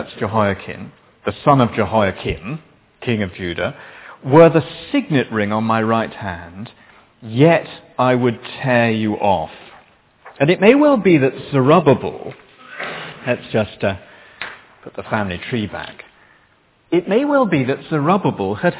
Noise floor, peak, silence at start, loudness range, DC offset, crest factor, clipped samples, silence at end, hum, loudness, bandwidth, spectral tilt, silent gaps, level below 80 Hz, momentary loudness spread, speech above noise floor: -56 dBFS; 0 dBFS; 0 s; 8 LU; under 0.1%; 18 dB; under 0.1%; 0 s; none; -17 LUFS; 4 kHz; -11 dB/octave; none; -46 dBFS; 19 LU; 39 dB